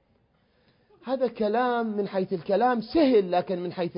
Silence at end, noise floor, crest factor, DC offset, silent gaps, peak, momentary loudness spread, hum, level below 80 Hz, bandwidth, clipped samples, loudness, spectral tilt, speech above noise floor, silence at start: 0 s; -66 dBFS; 16 dB; under 0.1%; none; -10 dBFS; 9 LU; none; -62 dBFS; 5.4 kHz; under 0.1%; -25 LUFS; -10.5 dB/octave; 42 dB; 1.05 s